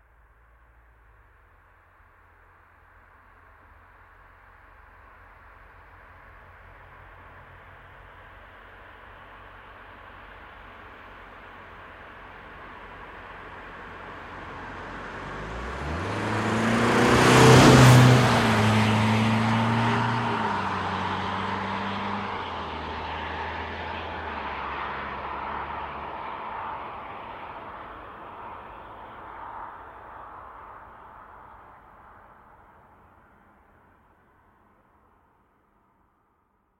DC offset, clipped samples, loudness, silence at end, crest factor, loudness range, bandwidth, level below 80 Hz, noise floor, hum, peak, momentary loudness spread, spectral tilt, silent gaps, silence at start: under 0.1%; under 0.1%; -23 LUFS; 5.35 s; 24 dB; 28 LU; 15.5 kHz; -48 dBFS; -68 dBFS; none; -2 dBFS; 27 LU; -5.5 dB/octave; none; 7.05 s